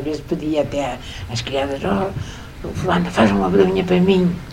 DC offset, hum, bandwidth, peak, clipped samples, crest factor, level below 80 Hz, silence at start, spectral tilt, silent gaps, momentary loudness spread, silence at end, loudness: under 0.1%; none; 15.5 kHz; 0 dBFS; under 0.1%; 18 dB; -38 dBFS; 0 s; -6.5 dB/octave; none; 14 LU; 0 s; -19 LUFS